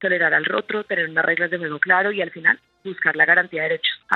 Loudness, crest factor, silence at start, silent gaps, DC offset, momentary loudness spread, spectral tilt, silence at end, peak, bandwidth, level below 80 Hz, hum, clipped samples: -19 LUFS; 20 dB; 0 s; none; under 0.1%; 8 LU; -5.5 dB/octave; 0 s; 0 dBFS; 4.5 kHz; -74 dBFS; none; under 0.1%